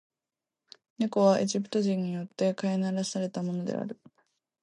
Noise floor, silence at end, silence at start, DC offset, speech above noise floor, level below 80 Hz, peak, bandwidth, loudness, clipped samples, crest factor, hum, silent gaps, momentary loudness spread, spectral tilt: under -90 dBFS; 0.7 s; 1 s; under 0.1%; over 62 dB; -78 dBFS; -10 dBFS; 10.5 kHz; -29 LUFS; under 0.1%; 20 dB; none; none; 11 LU; -6 dB/octave